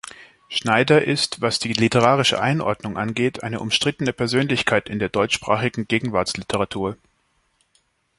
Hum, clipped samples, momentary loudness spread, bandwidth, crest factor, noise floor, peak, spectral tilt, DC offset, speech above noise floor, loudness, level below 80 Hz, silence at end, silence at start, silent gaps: none; under 0.1%; 9 LU; 11.5 kHz; 22 dB; -66 dBFS; 0 dBFS; -4.5 dB/octave; under 0.1%; 46 dB; -20 LUFS; -52 dBFS; 1.25 s; 0.05 s; none